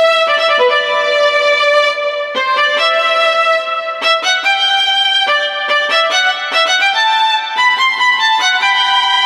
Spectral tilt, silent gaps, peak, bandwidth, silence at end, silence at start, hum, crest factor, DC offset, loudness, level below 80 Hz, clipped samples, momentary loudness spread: 2 dB/octave; none; 0 dBFS; 14 kHz; 0 s; 0 s; none; 12 dB; under 0.1%; -11 LUFS; -64 dBFS; under 0.1%; 3 LU